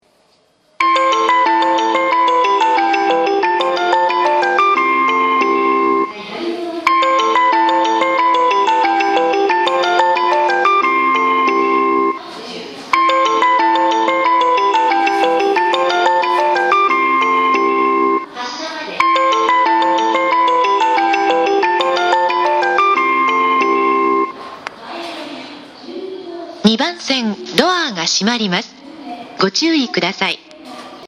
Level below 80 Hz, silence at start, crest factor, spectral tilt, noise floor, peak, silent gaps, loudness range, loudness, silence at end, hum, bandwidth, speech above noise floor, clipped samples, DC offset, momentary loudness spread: -62 dBFS; 0.8 s; 14 dB; -3.5 dB/octave; -56 dBFS; 0 dBFS; none; 4 LU; -14 LUFS; 0 s; none; 12 kHz; 39 dB; under 0.1%; under 0.1%; 14 LU